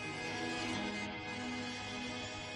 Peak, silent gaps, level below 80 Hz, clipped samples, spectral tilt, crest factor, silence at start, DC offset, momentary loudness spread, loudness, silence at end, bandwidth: -28 dBFS; none; -62 dBFS; under 0.1%; -3.5 dB/octave; 14 dB; 0 s; under 0.1%; 4 LU; -40 LUFS; 0 s; 12 kHz